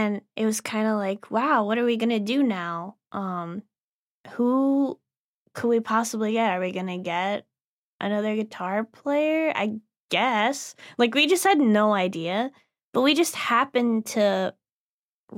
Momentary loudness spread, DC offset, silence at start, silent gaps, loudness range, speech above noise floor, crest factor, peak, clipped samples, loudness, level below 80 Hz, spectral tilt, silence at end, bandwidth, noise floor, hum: 13 LU; under 0.1%; 0 s; 3.78-4.24 s, 5.17-5.46 s, 7.64-8.00 s, 10.00-10.09 s, 12.85-12.93 s, 14.72-15.28 s; 5 LU; over 66 dB; 18 dB; -8 dBFS; under 0.1%; -24 LUFS; -80 dBFS; -4 dB/octave; 0 s; 16.5 kHz; under -90 dBFS; none